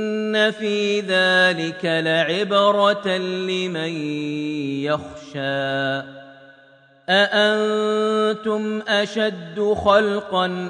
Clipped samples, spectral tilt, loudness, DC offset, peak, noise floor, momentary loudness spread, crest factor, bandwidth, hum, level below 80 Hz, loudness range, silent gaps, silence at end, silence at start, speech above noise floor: under 0.1%; -4.5 dB/octave; -20 LUFS; under 0.1%; -4 dBFS; -52 dBFS; 9 LU; 18 dB; 10 kHz; none; -58 dBFS; 6 LU; none; 0 s; 0 s; 31 dB